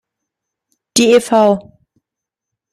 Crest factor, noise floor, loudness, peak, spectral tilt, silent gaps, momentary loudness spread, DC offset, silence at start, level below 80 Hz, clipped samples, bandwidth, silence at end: 16 dB; -83 dBFS; -13 LUFS; 0 dBFS; -3.5 dB/octave; none; 8 LU; under 0.1%; 0.95 s; -58 dBFS; under 0.1%; 14 kHz; 1.15 s